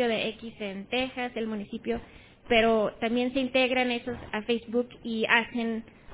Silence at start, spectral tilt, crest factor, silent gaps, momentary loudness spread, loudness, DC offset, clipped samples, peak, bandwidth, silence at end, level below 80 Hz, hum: 0 s; -8 dB/octave; 22 dB; none; 11 LU; -28 LUFS; under 0.1%; under 0.1%; -6 dBFS; 4 kHz; 0 s; -54 dBFS; none